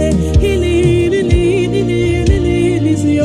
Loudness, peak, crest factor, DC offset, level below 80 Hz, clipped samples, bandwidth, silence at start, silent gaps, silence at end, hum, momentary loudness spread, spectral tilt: -13 LUFS; 0 dBFS; 10 dB; under 0.1%; -22 dBFS; under 0.1%; 12.5 kHz; 0 s; none; 0 s; none; 2 LU; -7 dB/octave